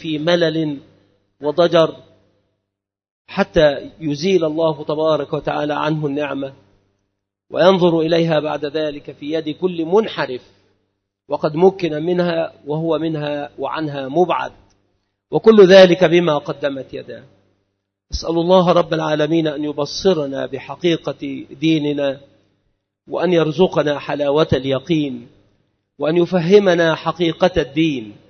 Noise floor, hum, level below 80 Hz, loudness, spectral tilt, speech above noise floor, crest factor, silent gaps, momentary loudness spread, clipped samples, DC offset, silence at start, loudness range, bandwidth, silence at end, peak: -81 dBFS; none; -46 dBFS; -17 LUFS; -6.5 dB/octave; 64 dB; 18 dB; 3.11-3.25 s; 13 LU; under 0.1%; under 0.1%; 0 s; 7 LU; 6.6 kHz; 0.15 s; 0 dBFS